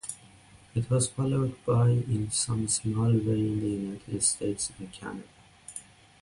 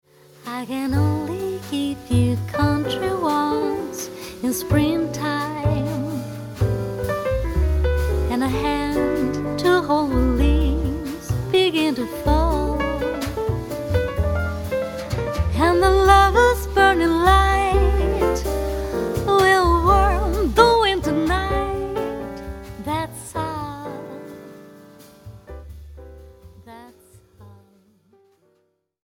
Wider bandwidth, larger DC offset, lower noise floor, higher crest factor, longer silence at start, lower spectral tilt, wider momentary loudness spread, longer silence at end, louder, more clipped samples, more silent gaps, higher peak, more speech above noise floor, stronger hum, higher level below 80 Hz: second, 11.5 kHz vs 17.5 kHz; neither; second, -55 dBFS vs -67 dBFS; about the same, 16 dB vs 20 dB; second, 0.05 s vs 0.45 s; about the same, -5.5 dB/octave vs -6 dB/octave; about the same, 17 LU vs 15 LU; second, 0.4 s vs 1.5 s; second, -28 LUFS vs -20 LUFS; neither; neither; second, -12 dBFS vs 0 dBFS; second, 27 dB vs 47 dB; neither; second, -54 dBFS vs -28 dBFS